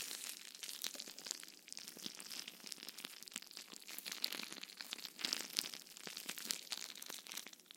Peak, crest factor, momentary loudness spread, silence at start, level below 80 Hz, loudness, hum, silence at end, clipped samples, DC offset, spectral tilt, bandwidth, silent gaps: -12 dBFS; 38 dB; 9 LU; 0 s; under -90 dBFS; -46 LUFS; none; 0 s; under 0.1%; under 0.1%; 0.5 dB/octave; 17 kHz; none